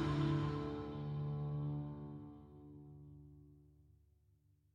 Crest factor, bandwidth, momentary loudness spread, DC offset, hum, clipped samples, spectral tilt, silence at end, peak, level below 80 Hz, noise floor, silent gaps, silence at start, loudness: 16 dB; 7.4 kHz; 21 LU; under 0.1%; none; under 0.1%; -8.5 dB/octave; 1.05 s; -26 dBFS; -60 dBFS; -73 dBFS; none; 0 s; -42 LUFS